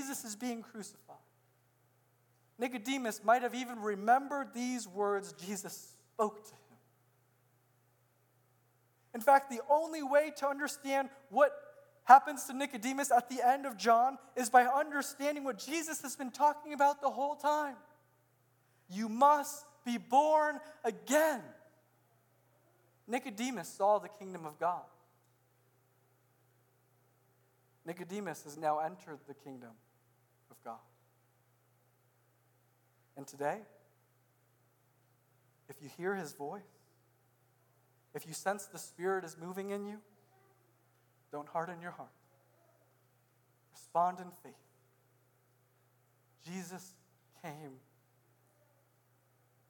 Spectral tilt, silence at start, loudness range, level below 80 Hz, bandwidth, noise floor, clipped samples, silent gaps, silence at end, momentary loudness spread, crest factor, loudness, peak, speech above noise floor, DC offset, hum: -3.5 dB/octave; 0 s; 18 LU; under -90 dBFS; 19 kHz; -72 dBFS; under 0.1%; none; 1.95 s; 22 LU; 30 dB; -33 LUFS; -6 dBFS; 38 dB; under 0.1%; none